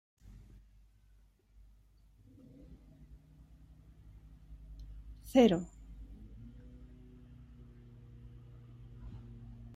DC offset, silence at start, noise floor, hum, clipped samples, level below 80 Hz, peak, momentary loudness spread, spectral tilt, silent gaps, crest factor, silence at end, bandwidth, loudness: under 0.1%; 0.25 s; -65 dBFS; none; under 0.1%; -56 dBFS; -14 dBFS; 29 LU; -6.5 dB/octave; none; 26 dB; 0 s; 15.5 kHz; -29 LUFS